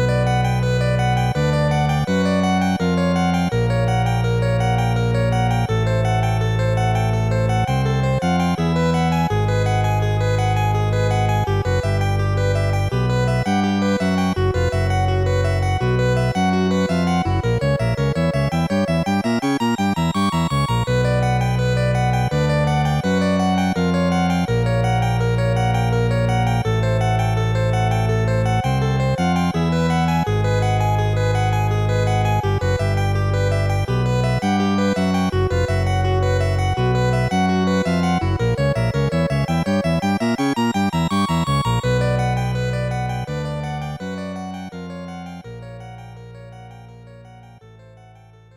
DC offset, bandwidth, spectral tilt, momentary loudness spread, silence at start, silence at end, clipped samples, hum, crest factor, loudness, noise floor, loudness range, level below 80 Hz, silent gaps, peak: under 0.1%; 16 kHz; -7 dB/octave; 2 LU; 0 s; 1 s; under 0.1%; none; 10 dB; -19 LUFS; -46 dBFS; 2 LU; -32 dBFS; none; -8 dBFS